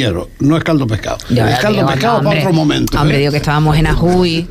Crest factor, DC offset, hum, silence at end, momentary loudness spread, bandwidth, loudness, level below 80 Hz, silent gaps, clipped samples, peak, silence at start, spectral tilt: 10 dB; under 0.1%; none; 0 s; 4 LU; 15.5 kHz; -13 LUFS; -26 dBFS; none; under 0.1%; -2 dBFS; 0 s; -6 dB/octave